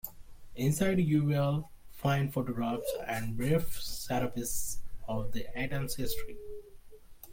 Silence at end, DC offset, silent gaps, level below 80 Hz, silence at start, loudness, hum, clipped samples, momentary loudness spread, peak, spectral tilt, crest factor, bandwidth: 0 s; under 0.1%; none; -46 dBFS; 0.05 s; -33 LUFS; none; under 0.1%; 16 LU; -16 dBFS; -5.5 dB/octave; 16 dB; 17 kHz